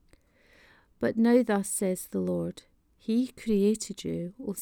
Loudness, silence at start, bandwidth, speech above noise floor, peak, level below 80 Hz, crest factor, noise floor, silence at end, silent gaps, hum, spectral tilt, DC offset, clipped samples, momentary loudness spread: -28 LUFS; 1 s; 19 kHz; 34 dB; -10 dBFS; -60 dBFS; 18 dB; -62 dBFS; 0 s; none; none; -5.5 dB/octave; under 0.1%; under 0.1%; 12 LU